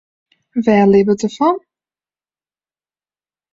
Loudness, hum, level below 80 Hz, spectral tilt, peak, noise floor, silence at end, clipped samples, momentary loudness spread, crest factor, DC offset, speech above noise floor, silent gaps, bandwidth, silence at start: -14 LUFS; none; -56 dBFS; -7 dB/octave; -2 dBFS; under -90 dBFS; 1.95 s; under 0.1%; 12 LU; 16 dB; under 0.1%; over 77 dB; none; 7.6 kHz; 0.55 s